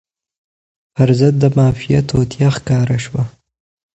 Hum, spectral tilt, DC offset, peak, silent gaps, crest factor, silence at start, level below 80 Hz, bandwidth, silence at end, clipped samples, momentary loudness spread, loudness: none; -7.5 dB/octave; under 0.1%; 0 dBFS; none; 16 dB; 0.95 s; -40 dBFS; 8.4 kHz; 0.7 s; under 0.1%; 10 LU; -15 LUFS